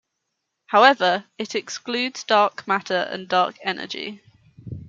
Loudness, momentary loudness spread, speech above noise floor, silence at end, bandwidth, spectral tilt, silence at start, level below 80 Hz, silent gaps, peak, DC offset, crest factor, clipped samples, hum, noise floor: -21 LUFS; 14 LU; 57 dB; 0 s; 7.6 kHz; -3.5 dB/octave; 0.7 s; -64 dBFS; none; -2 dBFS; under 0.1%; 22 dB; under 0.1%; none; -78 dBFS